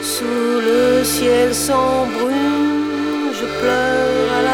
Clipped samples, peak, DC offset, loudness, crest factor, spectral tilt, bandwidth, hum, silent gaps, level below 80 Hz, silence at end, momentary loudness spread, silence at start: under 0.1%; -4 dBFS; under 0.1%; -16 LUFS; 14 dB; -3.5 dB/octave; over 20 kHz; none; none; -42 dBFS; 0 s; 5 LU; 0 s